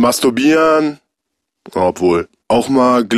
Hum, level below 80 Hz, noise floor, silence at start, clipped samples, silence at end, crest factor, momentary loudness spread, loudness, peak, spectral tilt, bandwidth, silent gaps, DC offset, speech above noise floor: none; -52 dBFS; -76 dBFS; 0 s; under 0.1%; 0 s; 12 dB; 7 LU; -14 LUFS; -2 dBFS; -4.5 dB/octave; 15.5 kHz; none; under 0.1%; 63 dB